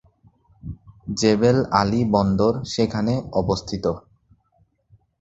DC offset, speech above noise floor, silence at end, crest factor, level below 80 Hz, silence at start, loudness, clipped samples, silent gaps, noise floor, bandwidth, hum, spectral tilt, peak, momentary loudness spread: under 0.1%; 44 dB; 1.2 s; 22 dB; -44 dBFS; 0.65 s; -21 LUFS; under 0.1%; none; -64 dBFS; 8 kHz; none; -6 dB/octave; -2 dBFS; 20 LU